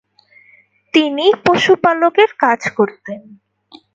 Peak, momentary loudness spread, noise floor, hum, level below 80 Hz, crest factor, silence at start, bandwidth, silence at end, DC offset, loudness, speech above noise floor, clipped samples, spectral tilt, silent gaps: 0 dBFS; 13 LU; -51 dBFS; none; -60 dBFS; 16 dB; 0.95 s; 7.8 kHz; 0.75 s; under 0.1%; -14 LUFS; 37 dB; under 0.1%; -4.5 dB/octave; none